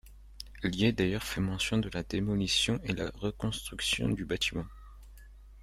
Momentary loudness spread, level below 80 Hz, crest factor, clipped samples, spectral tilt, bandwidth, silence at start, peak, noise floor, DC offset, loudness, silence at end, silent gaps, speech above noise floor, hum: 8 LU; -48 dBFS; 18 dB; under 0.1%; -4.5 dB/octave; 15.5 kHz; 0.05 s; -14 dBFS; -51 dBFS; under 0.1%; -31 LUFS; 0 s; none; 20 dB; none